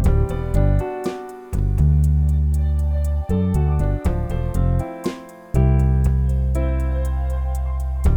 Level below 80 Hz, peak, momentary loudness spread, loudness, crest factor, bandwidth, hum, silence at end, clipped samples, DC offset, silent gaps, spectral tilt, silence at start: -22 dBFS; -4 dBFS; 9 LU; -21 LUFS; 14 dB; 11 kHz; none; 0 s; under 0.1%; under 0.1%; none; -8.5 dB/octave; 0 s